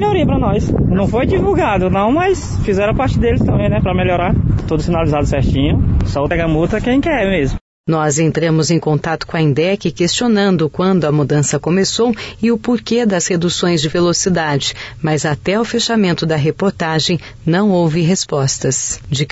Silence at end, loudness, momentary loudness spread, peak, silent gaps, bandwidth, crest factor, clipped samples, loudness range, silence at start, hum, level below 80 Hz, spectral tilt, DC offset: 0 s; -15 LUFS; 4 LU; -4 dBFS; 7.61-7.84 s; 8 kHz; 12 dB; under 0.1%; 1 LU; 0 s; none; -28 dBFS; -5 dB/octave; under 0.1%